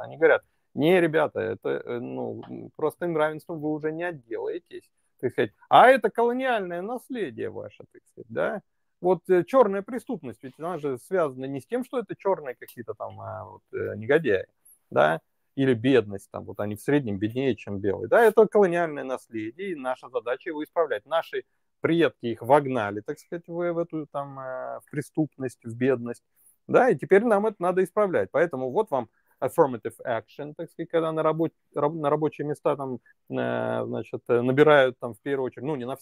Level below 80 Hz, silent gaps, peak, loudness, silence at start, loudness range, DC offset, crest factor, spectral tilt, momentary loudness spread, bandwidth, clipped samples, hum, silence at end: -72 dBFS; none; -4 dBFS; -25 LUFS; 0 s; 7 LU; under 0.1%; 22 dB; -7 dB/octave; 16 LU; 16 kHz; under 0.1%; none; 0.05 s